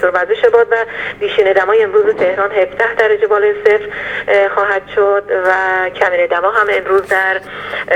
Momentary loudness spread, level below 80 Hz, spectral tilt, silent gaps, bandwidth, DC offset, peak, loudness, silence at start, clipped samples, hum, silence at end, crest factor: 5 LU; -50 dBFS; -4.5 dB/octave; none; 9.6 kHz; under 0.1%; 0 dBFS; -13 LUFS; 0 s; under 0.1%; 50 Hz at -45 dBFS; 0 s; 12 dB